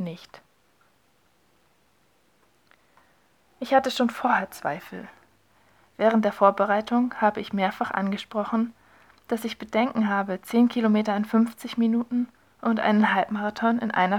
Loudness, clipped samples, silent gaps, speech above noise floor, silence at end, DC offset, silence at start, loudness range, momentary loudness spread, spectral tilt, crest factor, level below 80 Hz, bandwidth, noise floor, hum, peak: -24 LUFS; under 0.1%; none; 42 dB; 0 s; under 0.1%; 0 s; 4 LU; 11 LU; -6 dB/octave; 20 dB; -68 dBFS; 16.5 kHz; -65 dBFS; none; -6 dBFS